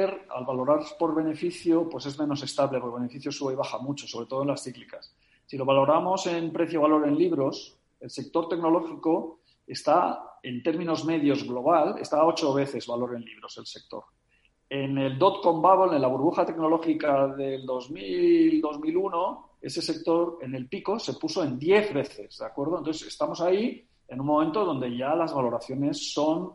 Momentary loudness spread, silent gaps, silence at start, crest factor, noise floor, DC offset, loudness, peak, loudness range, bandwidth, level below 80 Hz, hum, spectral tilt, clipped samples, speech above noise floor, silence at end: 14 LU; none; 0 s; 20 dB; -67 dBFS; under 0.1%; -26 LUFS; -6 dBFS; 5 LU; 11.5 kHz; -68 dBFS; none; -6 dB/octave; under 0.1%; 41 dB; 0 s